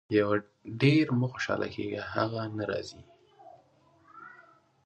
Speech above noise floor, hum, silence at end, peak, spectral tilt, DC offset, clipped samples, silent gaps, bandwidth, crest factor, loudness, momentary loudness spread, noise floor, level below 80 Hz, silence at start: 34 dB; none; 0.45 s; -10 dBFS; -7 dB/octave; under 0.1%; under 0.1%; none; 9.4 kHz; 22 dB; -29 LUFS; 24 LU; -63 dBFS; -62 dBFS; 0.1 s